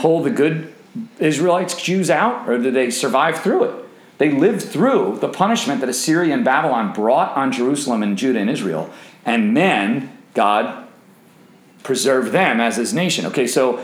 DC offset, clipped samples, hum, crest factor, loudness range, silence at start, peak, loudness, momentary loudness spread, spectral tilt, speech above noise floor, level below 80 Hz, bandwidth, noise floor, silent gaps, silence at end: under 0.1%; under 0.1%; none; 16 dB; 2 LU; 0 s; -2 dBFS; -18 LUFS; 9 LU; -4.5 dB/octave; 31 dB; -74 dBFS; 17 kHz; -48 dBFS; none; 0 s